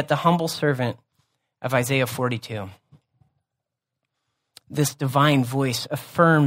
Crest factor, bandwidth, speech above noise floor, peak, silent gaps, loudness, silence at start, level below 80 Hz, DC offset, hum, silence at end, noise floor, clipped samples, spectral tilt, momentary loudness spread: 20 dB; 16 kHz; 62 dB; -4 dBFS; none; -23 LUFS; 0 s; -64 dBFS; under 0.1%; none; 0 s; -84 dBFS; under 0.1%; -5.5 dB/octave; 15 LU